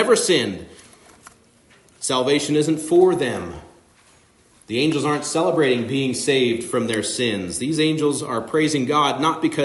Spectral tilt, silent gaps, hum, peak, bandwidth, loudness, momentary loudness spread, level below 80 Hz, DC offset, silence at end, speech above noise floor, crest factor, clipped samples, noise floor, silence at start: -4 dB/octave; none; none; -4 dBFS; 11.5 kHz; -20 LUFS; 9 LU; -60 dBFS; under 0.1%; 0 s; 35 dB; 18 dB; under 0.1%; -55 dBFS; 0 s